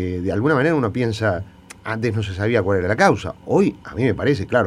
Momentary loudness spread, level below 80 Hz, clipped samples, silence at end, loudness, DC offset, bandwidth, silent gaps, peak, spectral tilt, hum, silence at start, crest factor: 8 LU; -46 dBFS; under 0.1%; 0 s; -20 LUFS; under 0.1%; 12.5 kHz; none; 0 dBFS; -7 dB/octave; none; 0 s; 18 dB